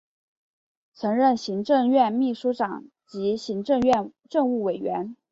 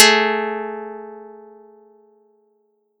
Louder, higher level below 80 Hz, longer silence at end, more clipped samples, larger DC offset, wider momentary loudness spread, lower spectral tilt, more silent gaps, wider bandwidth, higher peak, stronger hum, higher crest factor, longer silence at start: second, -24 LUFS vs -18 LUFS; first, -62 dBFS vs under -90 dBFS; second, 0.15 s vs 1.55 s; neither; neither; second, 9 LU vs 26 LU; first, -6.5 dB/octave vs -0.5 dB/octave; neither; second, 7.8 kHz vs 16.5 kHz; second, -8 dBFS vs 0 dBFS; neither; second, 16 dB vs 22 dB; first, 1 s vs 0 s